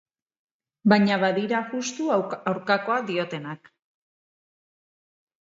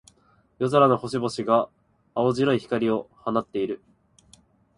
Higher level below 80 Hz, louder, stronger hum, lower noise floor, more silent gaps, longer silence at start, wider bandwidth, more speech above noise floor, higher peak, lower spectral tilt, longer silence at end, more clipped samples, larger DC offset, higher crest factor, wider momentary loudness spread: second, -74 dBFS vs -62 dBFS; about the same, -24 LUFS vs -24 LUFS; neither; first, under -90 dBFS vs -62 dBFS; neither; first, 0.85 s vs 0.6 s; second, 7.8 kHz vs 11.5 kHz; first, over 66 dB vs 39 dB; about the same, -4 dBFS vs -4 dBFS; about the same, -5.5 dB/octave vs -6.5 dB/octave; first, 1.85 s vs 1 s; neither; neither; about the same, 22 dB vs 20 dB; about the same, 12 LU vs 11 LU